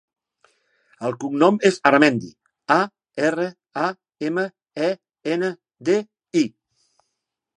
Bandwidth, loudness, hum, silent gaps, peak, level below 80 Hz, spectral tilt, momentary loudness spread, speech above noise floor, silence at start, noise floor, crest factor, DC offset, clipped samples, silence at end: 10.5 kHz; -22 LUFS; none; none; 0 dBFS; -72 dBFS; -5.5 dB/octave; 13 LU; 60 dB; 1 s; -80 dBFS; 22 dB; under 0.1%; under 0.1%; 1.1 s